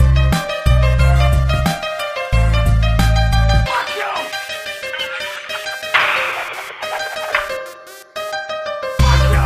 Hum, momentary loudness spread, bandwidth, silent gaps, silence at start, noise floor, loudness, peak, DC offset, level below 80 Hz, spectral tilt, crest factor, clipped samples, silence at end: none; 11 LU; 15.5 kHz; none; 0 s; -36 dBFS; -17 LUFS; 0 dBFS; under 0.1%; -18 dBFS; -5 dB/octave; 16 dB; under 0.1%; 0 s